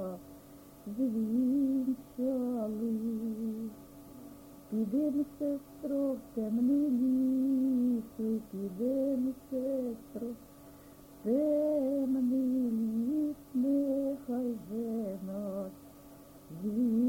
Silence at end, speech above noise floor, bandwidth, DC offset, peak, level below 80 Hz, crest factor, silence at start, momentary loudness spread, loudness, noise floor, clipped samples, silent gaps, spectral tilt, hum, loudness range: 0 s; 22 dB; 17 kHz; under 0.1%; -20 dBFS; -66 dBFS; 12 dB; 0 s; 19 LU; -33 LUFS; -54 dBFS; under 0.1%; none; -8.5 dB/octave; none; 5 LU